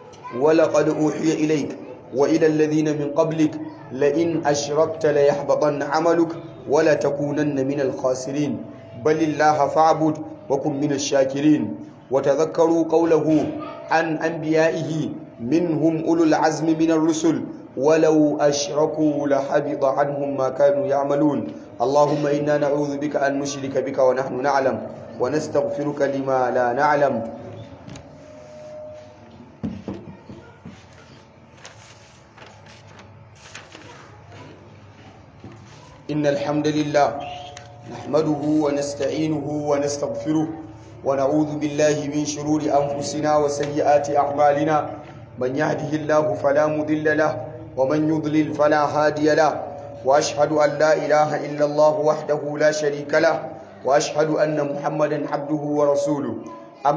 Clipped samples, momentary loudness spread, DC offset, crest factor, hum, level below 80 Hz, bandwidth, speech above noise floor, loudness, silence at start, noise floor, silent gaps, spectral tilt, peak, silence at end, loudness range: under 0.1%; 15 LU; under 0.1%; 16 dB; none; -58 dBFS; 8 kHz; 27 dB; -21 LUFS; 0 s; -47 dBFS; none; -5.5 dB/octave; -4 dBFS; 0 s; 6 LU